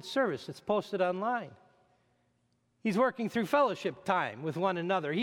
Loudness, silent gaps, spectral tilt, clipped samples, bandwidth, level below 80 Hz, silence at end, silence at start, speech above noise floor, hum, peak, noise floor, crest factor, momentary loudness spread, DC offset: -32 LUFS; none; -6 dB/octave; under 0.1%; 17 kHz; -76 dBFS; 0 s; 0 s; 43 dB; none; -14 dBFS; -74 dBFS; 18 dB; 8 LU; under 0.1%